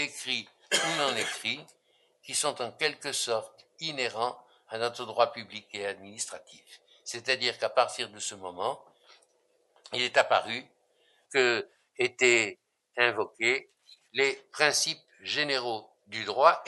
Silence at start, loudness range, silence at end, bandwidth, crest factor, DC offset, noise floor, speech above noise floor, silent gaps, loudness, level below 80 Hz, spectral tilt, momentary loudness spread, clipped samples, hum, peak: 0 s; 5 LU; 0 s; 12 kHz; 26 dB; under 0.1%; -70 dBFS; 41 dB; none; -29 LUFS; -84 dBFS; -1.5 dB/octave; 14 LU; under 0.1%; none; -6 dBFS